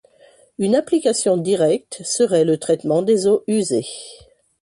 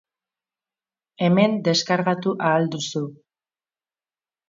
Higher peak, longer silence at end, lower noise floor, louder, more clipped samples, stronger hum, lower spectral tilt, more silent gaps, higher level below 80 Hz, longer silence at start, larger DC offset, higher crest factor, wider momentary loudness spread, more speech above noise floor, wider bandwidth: about the same, -4 dBFS vs -4 dBFS; second, 0.5 s vs 1.35 s; second, -52 dBFS vs under -90 dBFS; first, -18 LUFS vs -21 LUFS; neither; neither; about the same, -5 dB/octave vs -5.5 dB/octave; neither; first, -62 dBFS vs -70 dBFS; second, 0.6 s vs 1.2 s; neither; second, 14 dB vs 20 dB; about the same, 8 LU vs 9 LU; second, 34 dB vs over 69 dB; first, 11.5 kHz vs 7.6 kHz